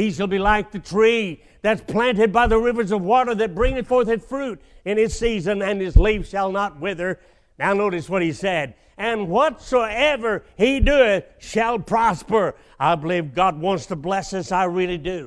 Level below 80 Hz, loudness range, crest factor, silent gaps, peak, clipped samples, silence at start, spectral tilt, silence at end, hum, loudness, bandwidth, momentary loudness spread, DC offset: -30 dBFS; 3 LU; 20 dB; none; 0 dBFS; under 0.1%; 0 s; -5.5 dB/octave; 0 s; none; -21 LUFS; 11 kHz; 8 LU; under 0.1%